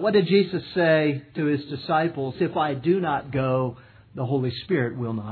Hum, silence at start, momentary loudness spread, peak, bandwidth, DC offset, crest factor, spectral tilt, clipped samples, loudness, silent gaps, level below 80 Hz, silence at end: none; 0 s; 8 LU; -6 dBFS; 4.6 kHz; under 0.1%; 16 dB; -10 dB/octave; under 0.1%; -24 LUFS; none; -58 dBFS; 0 s